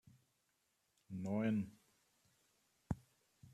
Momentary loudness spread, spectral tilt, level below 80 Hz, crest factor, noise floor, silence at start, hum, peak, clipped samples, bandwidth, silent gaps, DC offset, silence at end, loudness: 12 LU; -8 dB/octave; -70 dBFS; 20 dB; -82 dBFS; 1.1 s; none; -26 dBFS; under 0.1%; 13 kHz; none; under 0.1%; 0.05 s; -43 LUFS